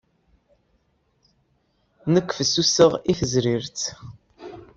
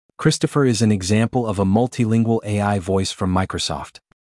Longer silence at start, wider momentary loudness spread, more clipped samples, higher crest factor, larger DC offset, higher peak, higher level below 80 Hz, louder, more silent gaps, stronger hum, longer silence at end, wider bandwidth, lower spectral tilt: first, 2.05 s vs 0.2 s; first, 25 LU vs 6 LU; neither; first, 22 dB vs 16 dB; neither; about the same, -2 dBFS vs -4 dBFS; about the same, -54 dBFS vs -50 dBFS; about the same, -21 LUFS vs -19 LUFS; neither; neither; second, 0.1 s vs 0.45 s; second, 8 kHz vs 12 kHz; second, -4 dB/octave vs -5.5 dB/octave